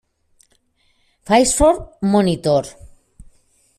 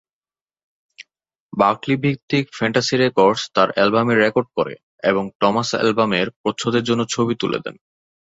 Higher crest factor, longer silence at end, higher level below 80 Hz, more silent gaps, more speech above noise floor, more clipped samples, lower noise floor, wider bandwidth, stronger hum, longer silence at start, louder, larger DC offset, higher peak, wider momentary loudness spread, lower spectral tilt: about the same, 18 dB vs 18 dB; first, 1.1 s vs 0.65 s; first, -36 dBFS vs -58 dBFS; second, none vs 1.40-1.49 s, 2.22-2.28 s, 4.83-4.98 s, 5.35-5.40 s, 6.36-6.44 s; second, 46 dB vs over 72 dB; neither; second, -62 dBFS vs under -90 dBFS; first, 14.5 kHz vs 8 kHz; neither; first, 1.25 s vs 1 s; first, -16 LUFS vs -19 LUFS; neither; about the same, -2 dBFS vs -2 dBFS; about the same, 7 LU vs 8 LU; about the same, -4.5 dB/octave vs -5 dB/octave